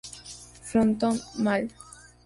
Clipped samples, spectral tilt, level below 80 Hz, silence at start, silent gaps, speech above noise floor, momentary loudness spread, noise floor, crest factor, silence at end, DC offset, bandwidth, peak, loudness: under 0.1%; -5.5 dB/octave; -56 dBFS; 0.05 s; none; 21 dB; 20 LU; -46 dBFS; 16 dB; 0.45 s; under 0.1%; 11.5 kHz; -12 dBFS; -26 LUFS